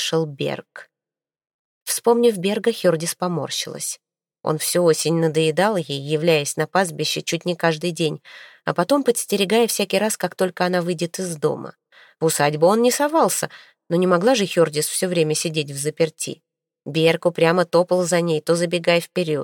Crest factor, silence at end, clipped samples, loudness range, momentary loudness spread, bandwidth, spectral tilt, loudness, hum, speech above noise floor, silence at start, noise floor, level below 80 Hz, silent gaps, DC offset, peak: 20 dB; 0 s; under 0.1%; 3 LU; 9 LU; 17 kHz; -4 dB/octave; -20 LUFS; none; over 70 dB; 0 s; under -90 dBFS; -70 dBFS; 1.54-1.86 s; under 0.1%; -2 dBFS